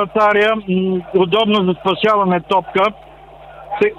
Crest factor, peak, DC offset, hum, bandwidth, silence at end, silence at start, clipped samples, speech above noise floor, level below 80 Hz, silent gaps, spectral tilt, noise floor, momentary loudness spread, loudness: 12 dB; -4 dBFS; under 0.1%; none; 8.4 kHz; 0.05 s; 0 s; under 0.1%; 24 dB; -50 dBFS; none; -7 dB/octave; -39 dBFS; 5 LU; -15 LUFS